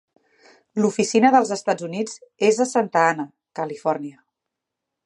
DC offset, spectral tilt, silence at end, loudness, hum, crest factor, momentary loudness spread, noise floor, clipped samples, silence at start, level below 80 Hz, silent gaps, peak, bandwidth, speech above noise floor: under 0.1%; -4.5 dB/octave; 0.95 s; -21 LUFS; none; 20 dB; 14 LU; -83 dBFS; under 0.1%; 0.75 s; -72 dBFS; none; -2 dBFS; 11.5 kHz; 63 dB